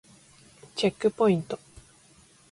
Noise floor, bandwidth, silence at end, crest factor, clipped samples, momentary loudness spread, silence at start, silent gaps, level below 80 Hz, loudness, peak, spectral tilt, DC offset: -58 dBFS; 11.5 kHz; 0.95 s; 18 dB; under 0.1%; 15 LU; 0.75 s; none; -62 dBFS; -27 LUFS; -12 dBFS; -6 dB/octave; under 0.1%